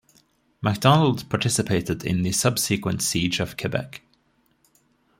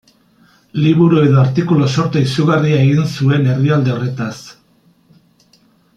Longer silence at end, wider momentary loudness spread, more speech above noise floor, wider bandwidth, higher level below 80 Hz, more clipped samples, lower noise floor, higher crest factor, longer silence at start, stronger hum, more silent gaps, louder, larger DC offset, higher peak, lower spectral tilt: second, 1.2 s vs 1.45 s; about the same, 10 LU vs 11 LU; about the same, 43 dB vs 41 dB; first, 16.5 kHz vs 9 kHz; about the same, -54 dBFS vs -52 dBFS; neither; first, -65 dBFS vs -53 dBFS; first, 22 dB vs 14 dB; second, 0.6 s vs 0.75 s; neither; neither; second, -23 LUFS vs -14 LUFS; neither; about the same, -2 dBFS vs -2 dBFS; second, -4.5 dB/octave vs -7.5 dB/octave